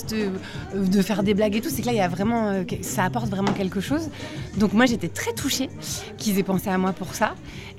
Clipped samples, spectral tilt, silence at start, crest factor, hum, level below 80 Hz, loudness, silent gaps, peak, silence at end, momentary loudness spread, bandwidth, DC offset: under 0.1%; -5 dB/octave; 0 s; 18 dB; none; -48 dBFS; -24 LUFS; none; -6 dBFS; 0 s; 9 LU; 16 kHz; under 0.1%